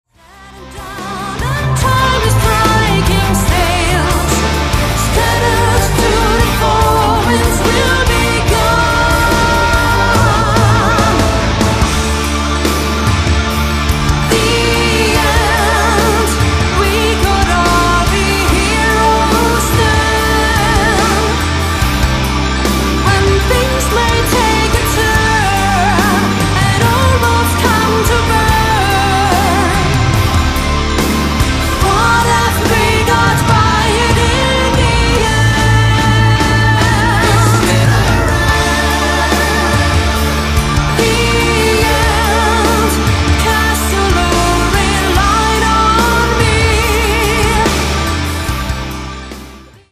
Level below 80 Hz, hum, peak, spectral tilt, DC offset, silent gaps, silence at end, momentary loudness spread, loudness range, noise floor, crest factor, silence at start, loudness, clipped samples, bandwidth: -18 dBFS; none; 0 dBFS; -4.5 dB/octave; under 0.1%; none; 0.3 s; 3 LU; 2 LU; -38 dBFS; 12 dB; 0.4 s; -11 LUFS; under 0.1%; 15.5 kHz